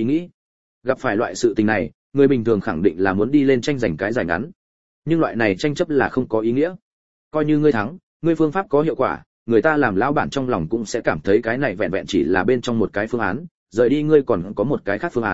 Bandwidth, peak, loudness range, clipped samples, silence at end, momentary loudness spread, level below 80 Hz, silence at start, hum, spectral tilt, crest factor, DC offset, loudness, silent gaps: 8 kHz; -2 dBFS; 2 LU; under 0.1%; 0 s; 8 LU; -50 dBFS; 0 s; none; -6.5 dB/octave; 18 dB; 0.8%; -20 LUFS; 0.34-0.81 s, 1.94-2.12 s, 4.56-5.02 s, 6.82-7.31 s, 8.03-8.20 s, 9.26-9.46 s, 13.51-13.66 s